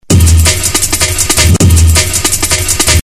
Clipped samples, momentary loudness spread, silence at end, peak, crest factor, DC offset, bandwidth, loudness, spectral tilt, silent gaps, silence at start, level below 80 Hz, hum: 2%; 3 LU; 0 s; 0 dBFS; 8 dB; 1%; 13.5 kHz; -8 LUFS; -3 dB/octave; none; 0.1 s; -14 dBFS; none